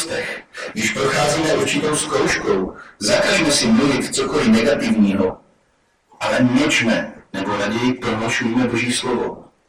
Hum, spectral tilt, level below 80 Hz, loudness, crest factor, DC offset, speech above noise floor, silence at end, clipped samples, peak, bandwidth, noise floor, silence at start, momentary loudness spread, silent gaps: none; -4 dB/octave; -46 dBFS; -18 LUFS; 14 dB; under 0.1%; 44 dB; 0.25 s; under 0.1%; -4 dBFS; 16 kHz; -61 dBFS; 0 s; 9 LU; none